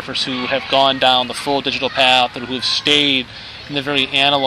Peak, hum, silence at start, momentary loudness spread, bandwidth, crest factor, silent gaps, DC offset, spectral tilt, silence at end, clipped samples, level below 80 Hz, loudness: 0 dBFS; none; 0 s; 8 LU; 15 kHz; 16 dB; none; under 0.1%; -3 dB/octave; 0 s; under 0.1%; -50 dBFS; -15 LUFS